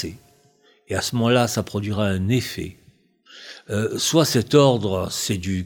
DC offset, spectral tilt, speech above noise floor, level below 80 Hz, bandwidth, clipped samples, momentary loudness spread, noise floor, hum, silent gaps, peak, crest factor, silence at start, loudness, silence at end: under 0.1%; -5 dB/octave; 37 dB; -52 dBFS; 19 kHz; under 0.1%; 16 LU; -58 dBFS; none; none; -2 dBFS; 20 dB; 0 s; -21 LUFS; 0 s